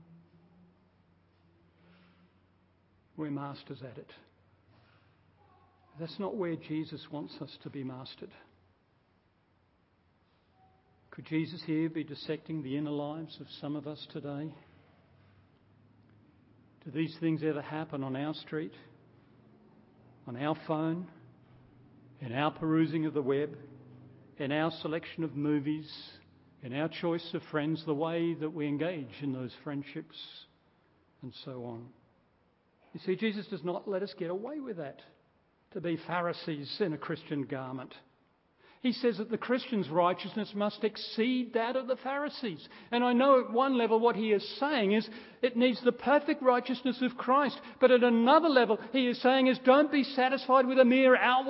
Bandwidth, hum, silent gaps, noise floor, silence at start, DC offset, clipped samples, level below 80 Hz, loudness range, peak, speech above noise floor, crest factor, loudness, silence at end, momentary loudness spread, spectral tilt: 5.8 kHz; none; none; -70 dBFS; 3.15 s; under 0.1%; under 0.1%; -76 dBFS; 19 LU; -10 dBFS; 39 dB; 22 dB; -31 LUFS; 0 s; 20 LU; -9.5 dB/octave